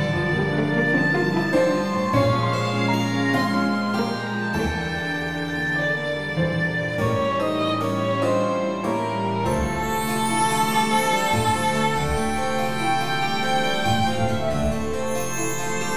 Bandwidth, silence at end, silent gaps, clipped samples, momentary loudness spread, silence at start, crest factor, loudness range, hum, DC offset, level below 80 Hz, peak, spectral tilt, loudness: 18.5 kHz; 0 s; none; under 0.1%; 5 LU; 0 s; 14 dB; 3 LU; none; under 0.1%; -42 dBFS; -8 dBFS; -5 dB/octave; -22 LUFS